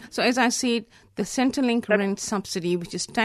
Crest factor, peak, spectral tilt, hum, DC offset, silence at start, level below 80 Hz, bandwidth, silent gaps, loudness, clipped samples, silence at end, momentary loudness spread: 18 dB; -6 dBFS; -3.5 dB/octave; none; under 0.1%; 0 s; -60 dBFS; 13.5 kHz; none; -24 LUFS; under 0.1%; 0 s; 8 LU